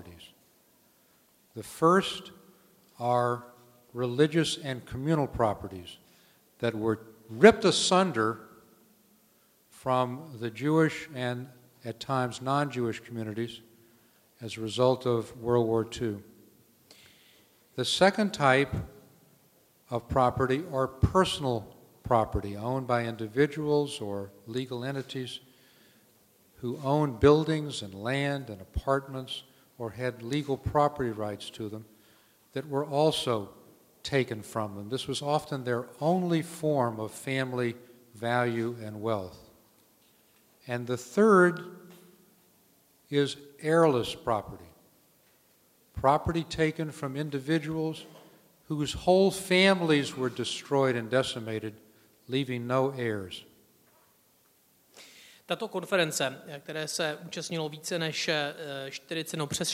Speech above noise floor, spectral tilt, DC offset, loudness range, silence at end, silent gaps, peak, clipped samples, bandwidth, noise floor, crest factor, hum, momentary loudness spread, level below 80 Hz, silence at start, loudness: 37 dB; -5 dB/octave; under 0.1%; 7 LU; 0 s; none; -2 dBFS; under 0.1%; 16 kHz; -65 dBFS; 26 dB; none; 16 LU; -54 dBFS; 0 s; -29 LUFS